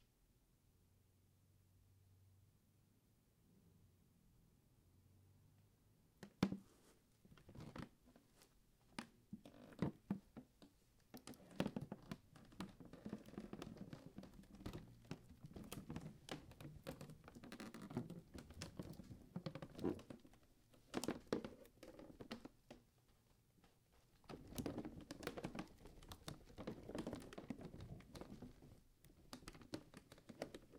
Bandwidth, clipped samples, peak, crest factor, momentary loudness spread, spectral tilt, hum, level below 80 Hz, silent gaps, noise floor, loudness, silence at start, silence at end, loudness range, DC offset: 16 kHz; under 0.1%; -24 dBFS; 32 dB; 15 LU; -5.5 dB/octave; none; -70 dBFS; none; -77 dBFS; -53 LUFS; 0 s; 0 s; 5 LU; under 0.1%